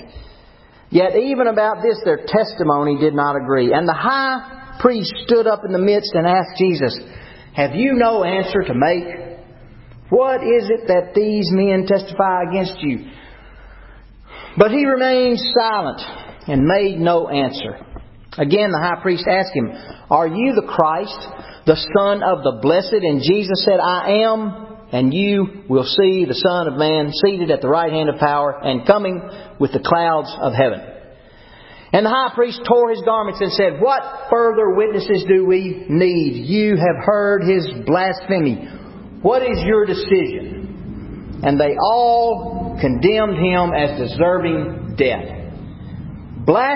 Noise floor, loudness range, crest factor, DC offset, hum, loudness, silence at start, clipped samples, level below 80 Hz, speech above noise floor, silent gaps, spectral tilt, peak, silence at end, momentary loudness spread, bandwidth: -46 dBFS; 3 LU; 18 dB; under 0.1%; none; -17 LUFS; 0 s; under 0.1%; -42 dBFS; 30 dB; none; -10 dB/octave; 0 dBFS; 0 s; 13 LU; 5.8 kHz